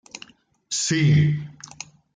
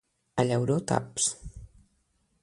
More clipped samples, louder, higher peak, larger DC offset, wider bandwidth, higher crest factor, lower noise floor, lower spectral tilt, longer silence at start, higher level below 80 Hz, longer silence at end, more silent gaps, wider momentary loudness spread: neither; first, -21 LUFS vs -28 LUFS; about the same, -8 dBFS vs -8 dBFS; neither; second, 9.4 kHz vs 11.5 kHz; second, 14 dB vs 22 dB; second, -49 dBFS vs -72 dBFS; about the same, -4.5 dB/octave vs -4.5 dB/octave; first, 0.7 s vs 0.35 s; about the same, -56 dBFS vs -52 dBFS; about the same, 0.65 s vs 0.75 s; neither; first, 22 LU vs 14 LU